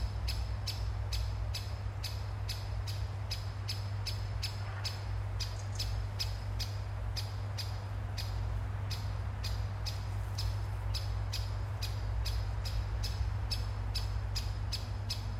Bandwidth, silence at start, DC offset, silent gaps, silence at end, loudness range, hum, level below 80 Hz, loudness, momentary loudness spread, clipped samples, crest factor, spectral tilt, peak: 15.5 kHz; 0 s; under 0.1%; none; 0 s; 1 LU; none; -40 dBFS; -38 LUFS; 2 LU; under 0.1%; 14 dB; -4.5 dB/octave; -22 dBFS